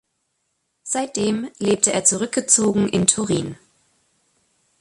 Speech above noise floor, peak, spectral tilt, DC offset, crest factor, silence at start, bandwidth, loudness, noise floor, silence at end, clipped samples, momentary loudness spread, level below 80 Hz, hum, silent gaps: 53 dB; 0 dBFS; -3.5 dB/octave; under 0.1%; 22 dB; 0.85 s; 11.5 kHz; -19 LUFS; -72 dBFS; 1.25 s; under 0.1%; 9 LU; -56 dBFS; none; none